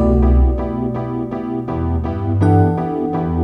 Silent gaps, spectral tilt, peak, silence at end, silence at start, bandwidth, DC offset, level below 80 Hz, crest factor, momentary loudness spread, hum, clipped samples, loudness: none; -11 dB/octave; -2 dBFS; 0 s; 0 s; 4 kHz; under 0.1%; -20 dBFS; 14 dB; 9 LU; none; under 0.1%; -18 LUFS